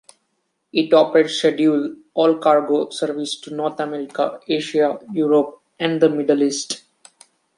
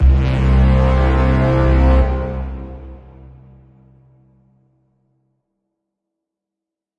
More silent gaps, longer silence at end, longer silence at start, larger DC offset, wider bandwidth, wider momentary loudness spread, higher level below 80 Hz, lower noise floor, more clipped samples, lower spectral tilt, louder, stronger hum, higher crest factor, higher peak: neither; second, 0.8 s vs 4.05 s; first, 0.75 s vs 0 s; neither; first, 11.5 kHz vs 5.2 kHz; second, 10 LU vs 19 LU; second, -70 dBFS vs -18 dBFS; second, -71 dBFS vs -85 dBFS; neither; second, -4.5 dB/octave vs -9 dB/octave; second, -19 LUFS vs -15 LUFS; neither; about the same, 18 dB vs 14 dB; about the same, -2 dBFS vs -2 dBFS